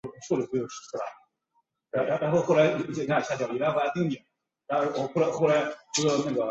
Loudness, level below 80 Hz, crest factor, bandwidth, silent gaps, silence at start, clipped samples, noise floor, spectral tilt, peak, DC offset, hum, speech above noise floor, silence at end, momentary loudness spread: -27 LUFS; -68 dBFS; 18 dB; 8.2 kHz; none; 0.05 s; under 0.1%; -74 dBFS; -5 dB/octave; -10 dBFS; under 0.1%; none; 47 dB; 0 s; 12 LU